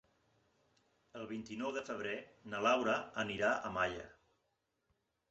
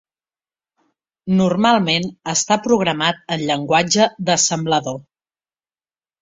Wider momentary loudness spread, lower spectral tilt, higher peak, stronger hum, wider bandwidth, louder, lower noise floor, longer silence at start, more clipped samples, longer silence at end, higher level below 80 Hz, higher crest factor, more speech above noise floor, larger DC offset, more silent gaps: first, 15 LU vs 6 LU; about the same, -2.5 dB/octave vs -3.5 dB/octave; second, -20 dBFS vs -2 dBFS; neither; about the same, 8 kHz vs 7.8 kHz; second, -38 LUFS vs -17 LUFS; second, -83 dBFS vs under -90 dBFS; about the same, 1.15 s vs 1.25 s; neither; about the same, 1.2 s vs 1.2 s; second, -70 dBFS vs -58 dBFS; about the same, 20 dB vs 18 dB; second, 45 dB vs over 73 dB; neither; neither